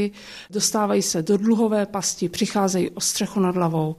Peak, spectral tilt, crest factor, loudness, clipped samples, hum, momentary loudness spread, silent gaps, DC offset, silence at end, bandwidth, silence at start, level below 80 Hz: -6 dBFS; -4.5 dB/octave; 14 dB; -22 LUFS; under 0.1%; none; 5 LU; none; under 0.1%; 0.05 s; 15 kHz; 0 s; -58 dBFS